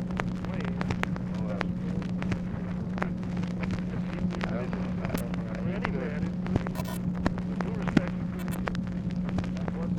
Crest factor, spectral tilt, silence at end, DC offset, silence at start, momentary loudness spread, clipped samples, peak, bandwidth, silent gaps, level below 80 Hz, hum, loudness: 22 dB; -7.5 dB/octave; 0 s; under 0.1%; 0 s; 2 LU; under 0.1%; -8 dBFS; 16 kHz; none; -44 dBFS; none; -31 LUFS